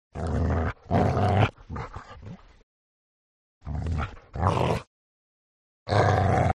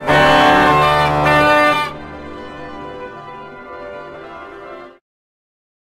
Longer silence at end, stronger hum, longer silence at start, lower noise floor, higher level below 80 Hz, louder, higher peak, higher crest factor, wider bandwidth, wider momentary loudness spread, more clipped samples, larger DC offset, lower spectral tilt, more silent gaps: second, 0.05 s vs 1.1 s; neither; first, 0.15 s vs 0 s; first, -44 dBFS vs -34 dBFS; about the same, -42 dBFS vs -40 dBFS; second, -26 LUFS vs -12 LUFS; second, -6 dBFS vs 0 dBFS; about the same, 20 dB vs 16 dB; second, 10.5 kHz vs 16 kHz; about the same, 21 LU vs 23 LU; neither; neither; first, -7.5 dB/octave vs -5 dB/octave; first, 2.63-3.61 s, 4.87-5.86 s vs none